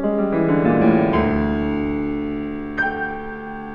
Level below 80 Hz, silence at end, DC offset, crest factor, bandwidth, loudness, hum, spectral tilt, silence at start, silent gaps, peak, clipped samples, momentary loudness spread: -38 dBFS; 0 s; under 0.1%; 16 dB; 5.4 kHz; -20 LUFS; none; -10 dB/octave; 0 s; none; -4 dBFS; under 0.1%; 11 LU